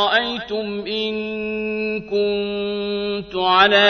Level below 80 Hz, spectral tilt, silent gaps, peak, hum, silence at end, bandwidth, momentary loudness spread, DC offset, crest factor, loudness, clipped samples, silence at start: -52 dBFS; -5 dB/octave; none; 0 dBFS; none; 0 s; 6.6 kHz; 8 LU; under 0.1%; 20 dB; -21 LUFS; under 0.1%; 0 s